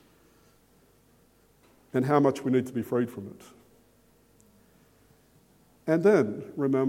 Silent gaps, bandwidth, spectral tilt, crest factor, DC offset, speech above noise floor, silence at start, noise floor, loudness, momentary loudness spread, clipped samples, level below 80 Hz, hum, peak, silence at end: none; 16.5 kHz; -8 dB/octave; 22 dB; under 0.1%; 37 dB; 1.95 s; -62 dBFS; -26 LUFS; 13 LU; under 0.1%; -70 dBFS; none; -8 dBFS; 0 s